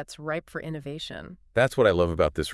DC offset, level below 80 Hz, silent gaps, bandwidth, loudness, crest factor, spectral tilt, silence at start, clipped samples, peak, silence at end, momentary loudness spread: under 0.1%; -48 dBFS; none; 12 kHz; -26 LUFS; 18 dB; -5.5 dB/octave; 0 s; under 0.1%; -8 dBFS; 0 s; 15 LU